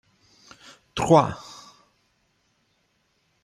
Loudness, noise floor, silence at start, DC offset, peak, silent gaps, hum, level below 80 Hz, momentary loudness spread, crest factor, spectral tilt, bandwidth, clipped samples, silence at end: -21 LUFS; -69 dBFS; 0.95 s; under 0.1%; -4 dBFS; none; none; -56 dBFS; 27 LU; 24 dB; -6 dB/octave; 13 kHz; under 0.1%; 2 s